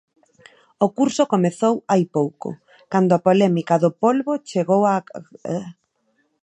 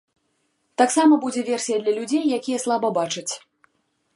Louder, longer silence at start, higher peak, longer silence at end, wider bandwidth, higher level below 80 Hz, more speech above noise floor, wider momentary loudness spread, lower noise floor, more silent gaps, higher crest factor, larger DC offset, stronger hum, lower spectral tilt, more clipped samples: about the same, -20 LUFS vs -21 LUFS; about the same, 0.8 s vs 0.8 s; about the same, -2 dBFS vs -4 dBFS; about the same, 0.7 s vs 0.8 s; second, 10 kHz vs 11.5 kHz; first, -70 dBFS vs -78 dBFS; about the same, 48 dB vs 49 dB; first, 16 LU vs 12 LU; about the same, -67 dBFS vs -70 dBFS; neither; about the same, 18 dB vs 20 dB; neither; neither; first, -7 dB/octave vs -3.5 dB/octave; neither